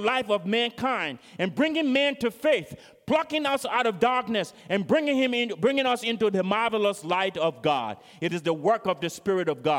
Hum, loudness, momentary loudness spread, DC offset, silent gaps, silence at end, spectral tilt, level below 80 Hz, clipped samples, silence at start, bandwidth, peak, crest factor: none; -25 LUFS; 6 LU; under 0.1%; none; 0 s; -5 dB/octave; -66 dBFS; under 0.1%; 0 s; 16.5 kHz; -8 dBFS; 16 dB